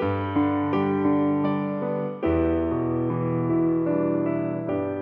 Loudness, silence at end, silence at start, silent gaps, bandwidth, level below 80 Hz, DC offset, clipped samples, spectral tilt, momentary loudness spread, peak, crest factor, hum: -24 LUFS; 0 s; 0 s; none; 4.3 kHz; -46 dBFS; under 0.1%; under 0.1%; -11 dB/octave; 5 LU; -12 dBFS; 12 dB; none